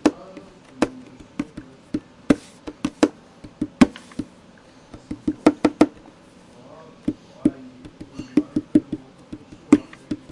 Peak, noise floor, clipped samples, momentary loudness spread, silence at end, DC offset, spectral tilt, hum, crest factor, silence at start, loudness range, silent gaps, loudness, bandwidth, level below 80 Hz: 0 dBFS; -49 dBFS; under 0.1%; 22 LU; 0.15 s; under 0.1%; -6 dB/octave; none; 24 dB; 0.05 s; 3 LU; none; -23 LUFS; 11.5 kHz; -50 dBFS